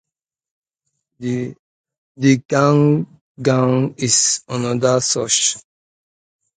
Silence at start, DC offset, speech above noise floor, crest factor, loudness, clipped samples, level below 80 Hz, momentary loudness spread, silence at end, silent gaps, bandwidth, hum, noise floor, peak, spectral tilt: 1.2 s; under 0.1%; 59 dB; 18 dB; -17 LUFS; under 0.1%; -60 dBFS; 11 LU; 0.95 s; 1.59-1.84 s, 1.98-2.15 s, 2.45-2.49 s, 3.21-3.35 s; 9.6 kHz; none; -76 dBFS; 0 dBFS; -4 dB/octave